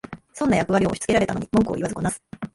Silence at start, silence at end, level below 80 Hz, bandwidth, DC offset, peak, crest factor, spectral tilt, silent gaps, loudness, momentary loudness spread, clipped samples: 0.1 s; 0.05 s; -46 dBFS; 11.5 kHz; under 0.1%; -6 dBFS; 16 dB; -5.5 dB/octave; none; -22 LUFS; 8 LU; under 0.1%